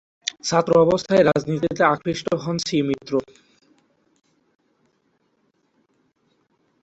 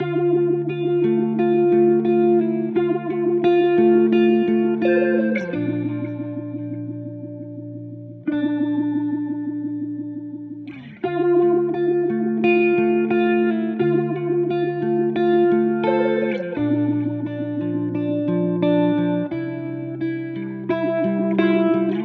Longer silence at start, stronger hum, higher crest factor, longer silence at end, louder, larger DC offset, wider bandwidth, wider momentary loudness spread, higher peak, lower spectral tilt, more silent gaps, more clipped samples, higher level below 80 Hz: first, 0.45 s vs 0 s; neither; about the same, 20 dB vs 16 dB; first, 3.6 s vs 0 s; about the same, -20 LUFS vs -20 LUFS; neither; first, 8.2 kHz vs 4.8 kHz; second, 9 LU vs 13 LU; about the same, -2 dBFS vs -4 dBFS; second, -5 dB/octave vs -10 dB/octave; neither; neither; first, -58 dBFS vs -70 dBFS